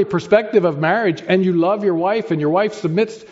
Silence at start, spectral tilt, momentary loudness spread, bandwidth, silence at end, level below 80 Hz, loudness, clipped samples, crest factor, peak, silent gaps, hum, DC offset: 0 s; -5.5 dB/octave; 4 LU; 8 kHz; 0.05 s; -62 dBFS; -17 LUFS; under 0.1%; 14 dB; -2 dBFS; none; none; under 0.1%